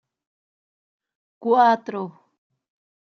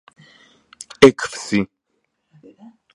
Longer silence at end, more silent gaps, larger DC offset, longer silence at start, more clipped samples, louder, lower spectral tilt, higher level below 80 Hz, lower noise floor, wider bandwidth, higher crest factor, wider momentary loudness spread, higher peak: second, 1 s vs 1.3 s; neither; neither; first, 1.4 s vs 1 s; neither; second, -20 LUFS vs -16 LUFS; about the same, -3.5 dB/octave vs -4.5 dB/octave; second, -82 dBFS vs -56 dBFS; first, under -90 dBFS vs -72 dBFS; second, 6.6 kHz vs 11.5 kHz; about the same, 20 dB vs 20 dB; about the same, 16 LU vs 18 LU; second, -6 dBFS vs 0 dBFS